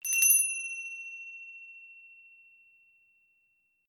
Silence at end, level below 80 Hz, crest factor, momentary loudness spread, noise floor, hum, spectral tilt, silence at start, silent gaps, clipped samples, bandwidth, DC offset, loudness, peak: 1.8 s; under -90 dBFS; 24 dB; 26 LU; -73 dBFS; none; 7.5 dB/octave; 0.05 s; none; under 0.1%; 19 kHz; under 0.1%; -25 LUFS; -10 dBFS